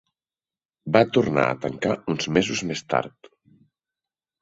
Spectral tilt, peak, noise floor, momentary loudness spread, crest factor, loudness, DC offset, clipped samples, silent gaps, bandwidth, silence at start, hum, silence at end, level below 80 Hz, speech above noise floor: -5 dB/octave; -2 dBFS; under -90 dBFS; 8 LU; 24 dB; -23 LUFS; under 0.1%; under 0.1%; none; 8 kHz; 0.85 s; none; 1.35 s; -58 dBFS; over 67 dB